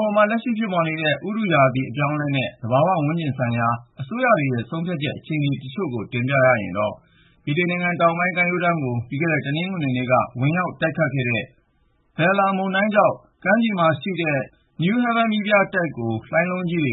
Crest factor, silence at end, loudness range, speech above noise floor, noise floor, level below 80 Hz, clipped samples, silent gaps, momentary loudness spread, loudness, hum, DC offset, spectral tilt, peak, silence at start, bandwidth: 20 dB; 0 s; 2 LU; 42 dB; -63 dBFS; -60 dBFS; under 0.1%; none; 8 LU; -21 LUFS; none; under 0.1%; -11.5 dB/octave; -2 dBFS; 0 s; 4.1 kHz